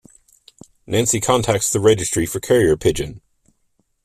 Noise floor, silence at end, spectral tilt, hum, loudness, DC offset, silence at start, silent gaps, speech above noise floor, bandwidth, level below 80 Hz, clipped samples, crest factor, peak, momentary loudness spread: -66 dBFS; 0.85 s; -4 dB/octave; none; -18 LUFS; under 0.1%; 0.9 s; none; 48 dB; 15.5 kHz; -42 dBFS; under 0.1%; 18 dB; 0 dBFS; 7 LU